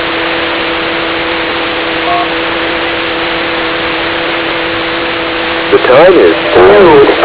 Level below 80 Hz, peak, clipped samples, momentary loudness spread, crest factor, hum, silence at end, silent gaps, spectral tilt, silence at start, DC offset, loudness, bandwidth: -36 dBFS; 0 dBFS; 3%; 8 LU; 8 dB; none; 0 s; none; -8 dB/octave; 0 s; under 0.1%; -9 LUFS; 4 kHz